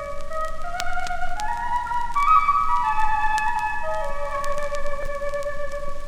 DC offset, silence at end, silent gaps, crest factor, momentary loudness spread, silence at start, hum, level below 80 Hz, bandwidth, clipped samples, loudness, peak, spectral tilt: under 0.1%; 0 s; none; 18 dB; 12 LU; 0 s; none; -30 dBFS; 10.5 kHz; under 0.1%; -24 LUFS; -4 dBFS; -3.5 dB/octave